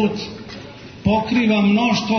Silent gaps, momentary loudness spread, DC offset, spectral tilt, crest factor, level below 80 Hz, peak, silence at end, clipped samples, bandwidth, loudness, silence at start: none; 19 LU; under 0.1%; -6 dB/octave; 14 dB; -46 dBFS; -4 dBFS; 0 s; under 0.1%; 6.6 kHz; -18 LUFS; 0 s